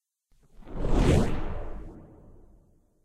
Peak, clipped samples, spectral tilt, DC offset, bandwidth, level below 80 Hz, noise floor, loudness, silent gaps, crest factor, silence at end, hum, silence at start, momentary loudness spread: -10 dBFS; under 0.1%; -7 dB/octave; under 0.1%; 12 kHz; -32 dBFS; -64 dBFS; -28 LUFS; none; 18 dB; 1 s; none; 0.6 s; 23 LU